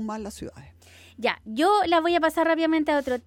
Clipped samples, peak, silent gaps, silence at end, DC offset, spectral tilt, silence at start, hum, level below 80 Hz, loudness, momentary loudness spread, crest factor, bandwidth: under 0.1%; -8 dBFS; none; 0.05 s; under 0.1%; -4.5 dB/octave; 0 s; none; -56 dBFS; -23 LUFS; 15 LU; 16 dB; 17 kHz